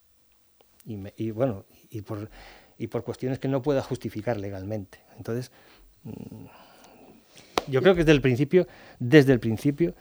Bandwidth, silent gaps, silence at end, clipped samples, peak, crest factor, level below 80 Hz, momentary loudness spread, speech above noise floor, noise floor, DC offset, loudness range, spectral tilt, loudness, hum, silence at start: over 20 kHz; none; 0.05 s; under 0.1%; 0 dBFS; 26 dB; -50 dBFS; 22 LU; 34 dB; -59 dBFS; under 0.1%; 13 LU; -7 dB/octave; -25 LUFS; none; 0.85 s